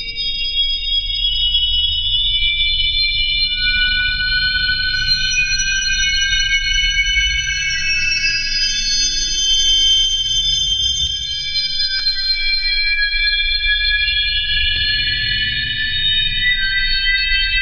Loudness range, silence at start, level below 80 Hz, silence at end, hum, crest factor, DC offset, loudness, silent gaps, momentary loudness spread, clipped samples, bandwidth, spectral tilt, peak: 1 LU; 0 s; -28 dBFS; 0 s; none; 14 dB; under 0.1%; -14 LUFS; none; 3 LU; under 0.1%; 6.8 kHz; 1 dB/octave; -4 dBFS